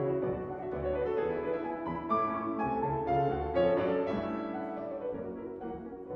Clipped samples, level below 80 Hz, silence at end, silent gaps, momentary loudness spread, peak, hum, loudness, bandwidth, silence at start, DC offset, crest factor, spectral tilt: under 0.1%; -52 dBFS; 0 s; none; 10 LU; -18 dBFS; none; -33 LUFS; 6.2 kHz; 0 s; under 0.1%; 16 dB; -9.5 dB/octave